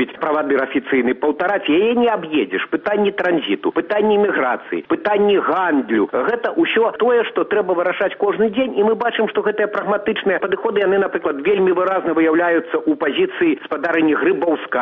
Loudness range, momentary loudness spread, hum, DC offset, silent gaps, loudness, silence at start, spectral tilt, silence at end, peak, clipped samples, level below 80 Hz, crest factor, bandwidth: 1 LU; 4 LU; none; under 0.1%; none; -18 LUFS; 0 s; -3 dB/octave; 0 s; -8 dBFS; under 0.1%; -60 dBFS; 10 dB; 4.3 kHz